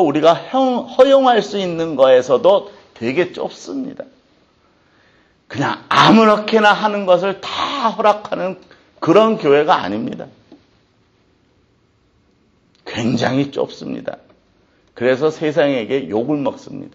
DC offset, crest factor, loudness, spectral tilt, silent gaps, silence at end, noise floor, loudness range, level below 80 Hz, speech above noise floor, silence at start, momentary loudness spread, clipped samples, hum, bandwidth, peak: under 0.1%; 16 dB; -16 LUFS; -5.5 dB/octave; none; 0.05 s; -58 dBFS; 10 LU; -60 dBFS; 43 dB; 0 s; 15 LU; under 0.1%; none; 8.2 kHz; 0 dBFS